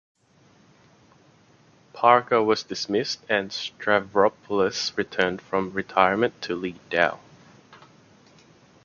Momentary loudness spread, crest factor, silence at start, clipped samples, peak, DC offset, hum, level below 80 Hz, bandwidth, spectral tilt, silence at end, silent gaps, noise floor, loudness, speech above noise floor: 9 LU; 24 dB; 1.95 s; under 0.1%; -2 dBFS; under 0.1%; none; -62 dBFS; 7.2 kHz; -4 dB/octave; 1.1 s; none; -58 dBFS; -24 LUFS; 35 dB